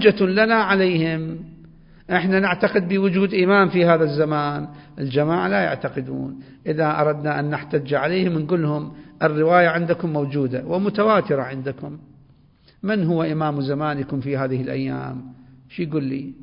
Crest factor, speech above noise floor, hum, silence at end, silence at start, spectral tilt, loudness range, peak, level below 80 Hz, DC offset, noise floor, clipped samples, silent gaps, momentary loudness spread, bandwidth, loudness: 20 dB; 34 dB; none; 0 s; 0 s; -11.5 dB/octave; 5 LU; -2 dBFS; -56 dBFS; under 0.1%; -54 dBFS; under 0.1%; none; 14 LU; 5.4 kHz; -21 LUFS